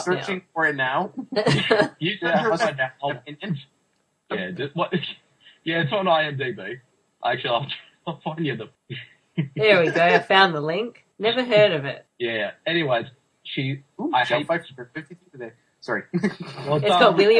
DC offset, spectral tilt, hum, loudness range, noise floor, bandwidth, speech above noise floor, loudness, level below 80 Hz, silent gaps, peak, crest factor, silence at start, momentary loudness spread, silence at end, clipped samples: under 0.1%; -5.5 dB/octave; none; 8 LU; -69 dBFS; 10.5 kHz; 47 dB; -22 LUFS; -66 dBFS; none; -2 dBFS; 22 dB; 0 s; 19 LU; 0 s; under 0.1%